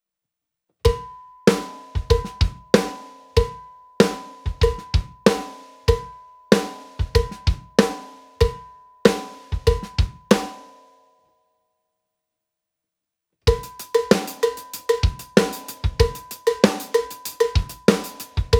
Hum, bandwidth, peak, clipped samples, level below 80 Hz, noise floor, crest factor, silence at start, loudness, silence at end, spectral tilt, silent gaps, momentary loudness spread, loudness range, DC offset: none; over 20 kHz; 0 dBFS; under 0.1%; -30 dBFS; -80 dBFS; 22 dB; 0.85 s; -22 LUFS; 0 s; -5.5 dB/octave; none; 12 LU; 5 LU; under 0.1%